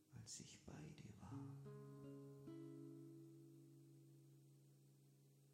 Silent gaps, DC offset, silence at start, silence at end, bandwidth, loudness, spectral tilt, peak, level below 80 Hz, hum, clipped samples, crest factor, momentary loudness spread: none; under 0.1%; 0 s; 0 s; 16.5 kHz; -60 LUFS; -5.5 dB/octave; -44 dBFS; -84 dBFS; none; under 0.1%; 18 dB; 11 LU